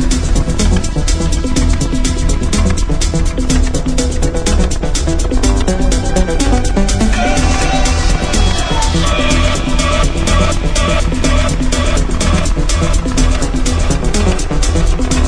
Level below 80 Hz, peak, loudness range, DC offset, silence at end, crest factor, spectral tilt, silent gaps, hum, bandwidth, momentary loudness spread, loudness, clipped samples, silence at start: -14 dBFS; 0 dBFS; 2 LU; under 0.1%; 0 s; 12 dB; -4.5 dB/octave; none; none; 11 kHz; 3 LU; -14 LUFS; under 0.1%; 0 s